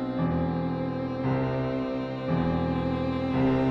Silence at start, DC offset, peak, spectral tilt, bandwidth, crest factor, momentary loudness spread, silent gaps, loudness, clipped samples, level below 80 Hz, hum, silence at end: 0 s; under 0.1%; -14 dBFS; -9.5 dB/octave; 6 kHz; 14 dB; 5 LU; none; -28 LUFS; under 0.1%; -46 dBFS; none; 0 s